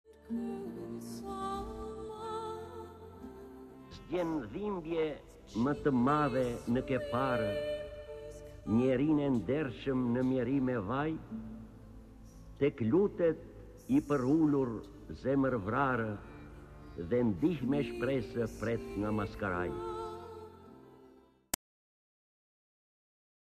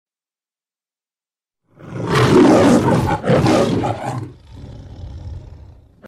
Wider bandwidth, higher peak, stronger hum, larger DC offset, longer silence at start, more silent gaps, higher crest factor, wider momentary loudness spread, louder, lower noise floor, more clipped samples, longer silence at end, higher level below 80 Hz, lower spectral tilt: about the same, 14 kHz vs 14 kHz; second, -10 dBFS vs 0 dBFS; neither; neither; second, 0.1 s vs 1.8 s; neither; first, 24 dB vs 18 dB; second, 20 LU vs 25 LU; second, -34 LUFS vs -14 LUFS; second, -61 dBFS vs under -90 dBFS; neither; first, 2.5 s vs 0.5 s; second, -56 dBFS vs -40 dBFS; about the same, -7 dB/octave vs -6.5 dB/octave